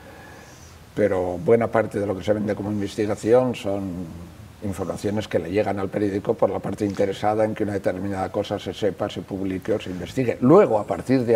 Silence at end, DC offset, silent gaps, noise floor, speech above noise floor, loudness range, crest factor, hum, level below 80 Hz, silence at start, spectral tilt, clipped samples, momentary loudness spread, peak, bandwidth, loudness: 0 s; under 0.1%; none; -45 dBFS; 22 dB; 3 LU; 20 dB; none; -52 dBFS; 0 s; -7 dB/octave; under 0.1%; 13 LU; -2 dBFS; 15.5 kHz; -23 LUFS